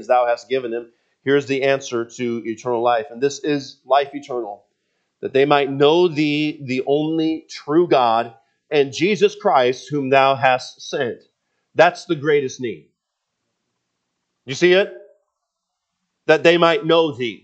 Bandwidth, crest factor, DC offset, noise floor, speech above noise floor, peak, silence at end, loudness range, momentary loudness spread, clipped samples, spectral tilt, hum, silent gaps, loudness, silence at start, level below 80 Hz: 8.4 kHz; 20 dB; under 0.1%; -78 dBFS; 60 dB; 0 dBFS; 0.1 s; 5 LU; 13 LU; under 0.1%; -5 dB/octave; none; none; -18 LUFS; 0 s; -76 dBFS